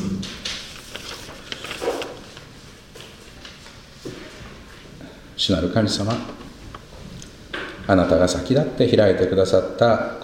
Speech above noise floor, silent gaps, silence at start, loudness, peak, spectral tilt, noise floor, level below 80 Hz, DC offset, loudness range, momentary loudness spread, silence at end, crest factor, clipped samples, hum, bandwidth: 25 dB; none; 0 s; -21 LUFS; -2 dBFS; -5.5 dB/octave; -43 dBFS; -44 dBFS; under 0.1%; 14 LU; 23 LU; 0 s; 22 dB; under 0.1%; none; 16.5 kHz